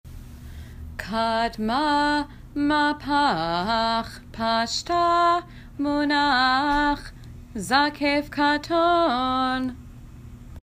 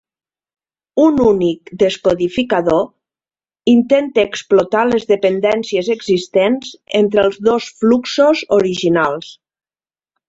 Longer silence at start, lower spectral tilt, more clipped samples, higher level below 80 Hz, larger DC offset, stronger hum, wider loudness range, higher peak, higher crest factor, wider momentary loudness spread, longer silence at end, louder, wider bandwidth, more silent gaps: second, 0.05 s vs 0.95 s; second, -4 dB/octave vs -5.5 dB/octave; neither; first, -44 dBFS vs -50 dBFS; neither; neither; about the same, 2 LU vs 2 LU; second, -6 dBFS vs -2 dBFS; about the same, 18 dB vs 14 dB; first, 19 LU vs 6 LU; second, 0.1 s vs 0.95 s; second, -23 LUFS vs -15 LUFS; first, 15.5 kHz vs 8 kHz; neither